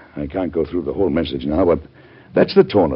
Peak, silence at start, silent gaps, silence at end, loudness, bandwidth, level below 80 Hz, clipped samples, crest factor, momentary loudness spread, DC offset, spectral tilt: 0 dBFS; 0.15 s; none; 0 s; -19 LUFS; 5.8 kHz; -40 dBFS; under 0.1%; 18 dB; 9 LU; under 0.1%; -6 dB/octave